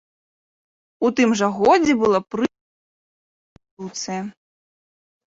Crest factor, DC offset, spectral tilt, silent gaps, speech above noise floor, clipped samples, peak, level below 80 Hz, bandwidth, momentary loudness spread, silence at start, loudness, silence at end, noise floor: 18 dB; under 0.1%; -4.5 dB/octave; 2.61-3.56 s, 3.71-3.77 s; over 71 dB; under 0.1%; -4 dBFS; -58 dBFS; 7.8 kHz; 15 LU; 1 s; -20 LUFS; 1 s; under -90 dBFS